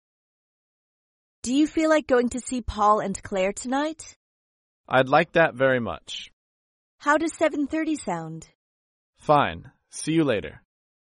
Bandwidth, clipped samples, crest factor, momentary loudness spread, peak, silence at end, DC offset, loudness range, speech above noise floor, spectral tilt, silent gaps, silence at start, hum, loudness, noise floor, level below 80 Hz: 11.5 kHz; under 0.1%; 20 dB; 16 LU; -6 dBFS; 0.7 s; under 0.1%; 4 LU; over 67 dB; -5 dB/octave; 4.16-4.84 s, 6.33-6.98 s, 8.55-9.13 s; 1.45 s; none; -24 LUFS; under -90 dBFS; -50 dBFS